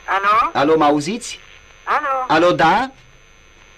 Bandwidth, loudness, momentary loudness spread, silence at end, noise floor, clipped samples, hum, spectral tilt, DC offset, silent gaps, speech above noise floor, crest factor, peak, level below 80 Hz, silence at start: 13.5 kHz; -16 LUFS; 15 LU; 0.85 s; -47 dBFS; under 0.1%; none; -4.5 dB/octave; under 0.1%; none; 31 dB; 12 dB; -4 dBFS; -48 dBFS; 0.05 s